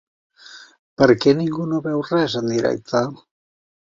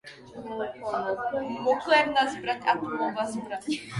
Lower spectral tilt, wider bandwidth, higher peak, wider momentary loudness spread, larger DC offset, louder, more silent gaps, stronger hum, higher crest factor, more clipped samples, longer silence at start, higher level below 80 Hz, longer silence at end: first, -6 dB/octave vs -4.5 dB/octave; second, 7.6 kHz vs 11.5 kHz; first, -2 dBFS vs -10 dBFS; second, 8 LU vs 13 LU; neither; first, -19 LUFS vs -27 LUFS; first, 0.79-0.97 s vs none; neither; about the same, 20 dB vs 18 dB; neither; first, 0.5 s vs 0.05 s; first, -56 dBFS vs -64 dBFS; first, 0.8 s vs 0 s